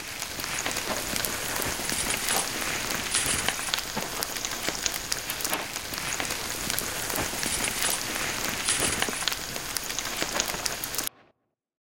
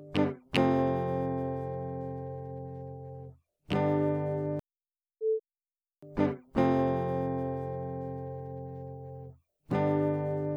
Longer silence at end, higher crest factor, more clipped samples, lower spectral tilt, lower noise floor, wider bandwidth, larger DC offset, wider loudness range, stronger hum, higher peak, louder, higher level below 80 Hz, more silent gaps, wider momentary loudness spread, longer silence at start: about the same, 0.1 s vs 0 s; first, 30 dB vs 18 dB; neither; second, -1 dB/octave vs -8.5 dB/octave; second, -70 dBFS vs under -90 dBFS; first, 17 kHz vs 11.5 kHz; first, 0.3% vs under 0.1%; about the same, 2 LU vs 3 LU; neither; first, -2 dBFS vs -14 dBFS; first, -27 LUFS vs -32 LUFS; first, -50 dBFS vs -58 dBFS; neither; second, 5 LU vs 16 LU; about the same, 0 s vs 0 s